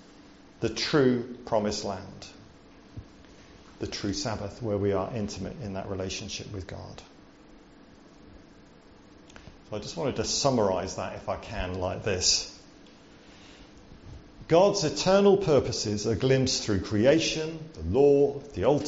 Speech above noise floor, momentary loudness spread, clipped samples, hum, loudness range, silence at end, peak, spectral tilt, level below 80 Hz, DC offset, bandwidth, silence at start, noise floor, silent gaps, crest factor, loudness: 27 dB; 19 LU; under 0.1%; none; 14 LU; 0 s; -8 dBFS; -4.5 dB/octave; -52 dBFS; under 0.1%; 8 kHz; 0.6 s; -53 dBFS; none; 20 dB; -27 LUFS